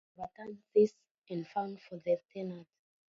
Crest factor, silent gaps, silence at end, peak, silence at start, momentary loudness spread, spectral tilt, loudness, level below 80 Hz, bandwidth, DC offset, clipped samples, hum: 20 dB; 1.11-1.22 s; 0.45 s; -16 dBFS; 0.2 s; 17 LU; -7 dB/octave; -35 LUFS; -78 dBFS; 7.2 kHz; under 0.1%; under 0.1%; none